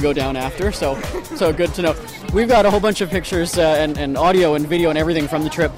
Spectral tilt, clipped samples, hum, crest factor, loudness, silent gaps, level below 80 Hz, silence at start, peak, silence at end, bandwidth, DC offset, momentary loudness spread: -5 dB/octave; under 0.1%; none; 12 dB; -18 LUFS; none; -32 dBFS; 0 s; -6 dBFS; 0 s; 16 kHz; under 0.1%; 8 LU